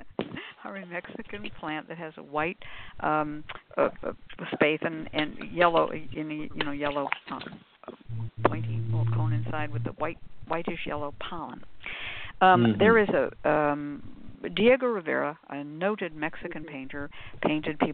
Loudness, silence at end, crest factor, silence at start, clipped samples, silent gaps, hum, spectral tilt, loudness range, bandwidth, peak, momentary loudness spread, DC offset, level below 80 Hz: -28 LUFS; 0 s; 22 dB; 0 s; under 0.1%; none; none; -4.5 dB/octave; 8 LU; 4.5 kHz; -6 dBFS; 18 LU; 0.5%; -54 dBFS